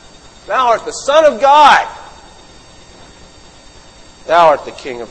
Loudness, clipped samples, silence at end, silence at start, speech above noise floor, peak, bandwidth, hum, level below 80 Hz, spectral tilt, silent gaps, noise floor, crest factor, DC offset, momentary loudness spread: -10 LUFS; 0.3%; 0.05 s; 0.5 s; 29 dB; 0 dBFS; 11 kHz; none; -46 dBFS; -2.5 dB/octave; none; -40 dBFS; 14 dB; under 0.1%; 19 LU